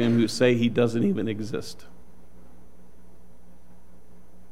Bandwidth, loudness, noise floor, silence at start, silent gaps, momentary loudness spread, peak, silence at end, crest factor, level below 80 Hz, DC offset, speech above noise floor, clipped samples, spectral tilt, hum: 14 kHz; -24 LUFS; -54 dBFS; 0 s; none; 16 LU; -8 dBFS; 2.8 s; 20 dB; -56 dBFS; 2%; 30 dB; under 0.1%; -6 dB/octave; 60 Hz at -55 dBFS